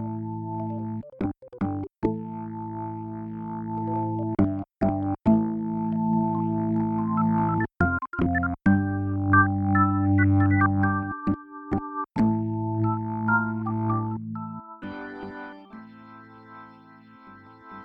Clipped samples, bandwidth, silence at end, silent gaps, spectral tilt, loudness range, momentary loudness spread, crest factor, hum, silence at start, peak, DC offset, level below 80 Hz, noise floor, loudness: under 0.1%; 4.6 kHz; 0 s; none; -11 dB/octave; 10 LU; 16 LU; 18 dB; none; 0 s; -6 dBFS; under 0.1%; -50 dBFS; -50 dBFS; -26 LUFS